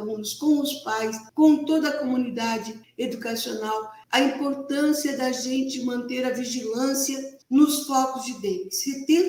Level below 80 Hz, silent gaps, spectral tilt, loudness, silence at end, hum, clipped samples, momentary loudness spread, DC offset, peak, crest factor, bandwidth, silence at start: -72 dBFS; none; -3 dB/octave; -25 LUFS; 0 s; none; under 0.1%; 10 LU; under 0.1%; -6 dBFS; 18 dB; 18.5 kHz; 0 s